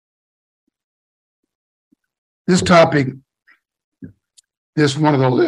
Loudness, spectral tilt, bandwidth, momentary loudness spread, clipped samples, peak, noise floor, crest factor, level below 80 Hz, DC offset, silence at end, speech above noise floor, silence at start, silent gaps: -15 LUFS; -6 dB/octave; 11.5 kHz; 14 LU; under 0.1%; 0 dBFS; -58 dBFS; 18 dB; -54 dBFS; under 0.1%; 0 s; 44 dB; 2.5 s; 3.84-3.92 s, 4.57-4.73 s